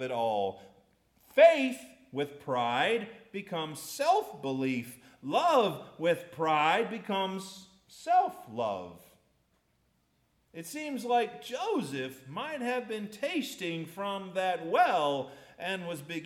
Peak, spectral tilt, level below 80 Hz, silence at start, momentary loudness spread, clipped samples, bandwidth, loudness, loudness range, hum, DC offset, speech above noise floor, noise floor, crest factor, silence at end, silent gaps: -10 dBFS; -4.5 dB/octave; -76 dBFS; 0 s; 15 LU; under 0.1%; 16 kHz; -30 LUFS; 7 LU; none; under 0.1%; 42 dB; -73 dBFS; 22 dB; 0 s; none